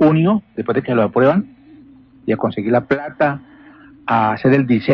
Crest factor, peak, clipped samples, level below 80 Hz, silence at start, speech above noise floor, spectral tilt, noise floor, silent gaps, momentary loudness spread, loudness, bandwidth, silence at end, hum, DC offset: 14 dB; -4 dBFS; under 0.1%; -52 dBFS; 0 s; 29 dB; -10 dB/octave; -45 dBFS; none; 10 LU; -17 LUFS; 5.8 kHz; 0 s; none; under 0.1%